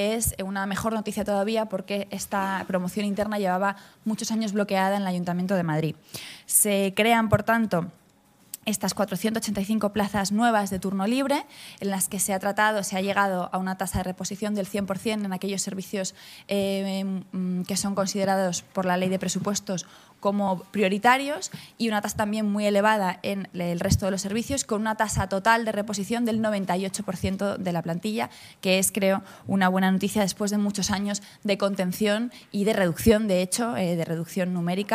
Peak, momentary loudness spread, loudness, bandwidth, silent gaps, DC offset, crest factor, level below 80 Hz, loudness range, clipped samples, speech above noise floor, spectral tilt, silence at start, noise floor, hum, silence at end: -4 dBFS; 9 LU; -26 LUFS; 15.5 kHz; none; under 0.1%; 22 dB; -50 dBFS; 4 LU; under 0.1%; 33 dB; -4.5 dB/octave; 0 s; -59 dBFS; none; 0 s